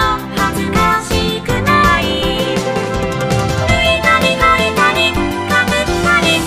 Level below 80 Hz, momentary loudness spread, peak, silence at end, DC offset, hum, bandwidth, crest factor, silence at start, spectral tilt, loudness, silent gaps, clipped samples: -28 dBFS; 6 LU; 0 dBFS; 0 s; under 0.1%; none; 15.5 kHz; 14 dB; 0 s; -4.5 dB/octave; -13 LUFS; none; under 0.1%